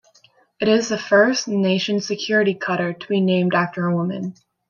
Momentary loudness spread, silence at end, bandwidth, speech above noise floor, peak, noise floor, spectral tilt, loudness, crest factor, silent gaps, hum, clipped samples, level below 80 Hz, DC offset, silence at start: 8 LU; 0.35 s; 7.4 kHz; 37 dB; -2 dBFS; -56 dBFS; -5 dB/octave; -20 LUFS; 18 dB; none; none; under 0.1%; -66 dBFS; under 0.1%; 0.6 s